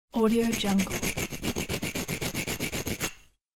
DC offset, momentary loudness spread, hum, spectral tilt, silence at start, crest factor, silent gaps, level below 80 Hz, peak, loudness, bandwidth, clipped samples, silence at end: under 0.1%; 7 LU; none; -4 dB/octave; 0.15 s; 16 dB; none; -46 dBFS; -14 dBFS; -29 LUFS; 18 kHz; under 0.1%; 0.4 s